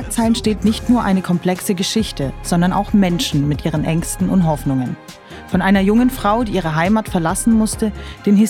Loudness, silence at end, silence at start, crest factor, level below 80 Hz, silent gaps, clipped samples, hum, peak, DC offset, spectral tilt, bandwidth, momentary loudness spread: -17 LUFS; 0 s; 0 s; 16 dB; -34 dBFS; none; under 0.1%; none; 0 dBFS; under 0.1%; -5.5 dB/octave; 16.5 kHz; 7 LU